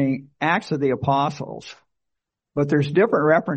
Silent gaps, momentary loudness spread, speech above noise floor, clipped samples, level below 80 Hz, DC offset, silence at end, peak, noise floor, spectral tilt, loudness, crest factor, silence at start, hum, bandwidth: none; 16 LU; 61 dB; under 0.1%; -58 dBFS; under 0.1%; 0 s; -4 dBFS; -82 dBFS; -7.5 dB/octave; -21 LUFS; 18 dB; 0 s; none; 8.4 kHz